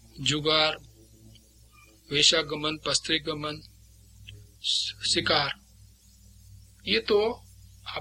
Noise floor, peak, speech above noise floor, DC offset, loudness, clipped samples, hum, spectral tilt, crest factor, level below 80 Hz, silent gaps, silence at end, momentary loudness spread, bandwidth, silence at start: -56 dBFS; -6 dBFS; 29 dB; under 0.1%; -25 LUFS; under 0.1%; 60 Hz at -55 dBFS; -2.5 dB/octave; 24 dB; -54 dBFS; none; 0 s; 18 LU; 16.5 kHz; 0.15 s